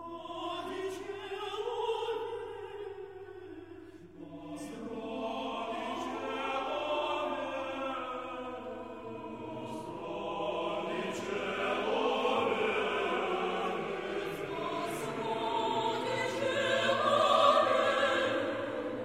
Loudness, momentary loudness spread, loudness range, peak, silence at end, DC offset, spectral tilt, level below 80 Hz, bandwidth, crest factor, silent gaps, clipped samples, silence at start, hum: -33 LUFS; 15 LU; 11 LU; -12 dBFS; 0 s; under 0.1%; -4 dB/octave; -70 dBFS; 16 kHz; 22 dB; none; under 0.1%; 0 s; none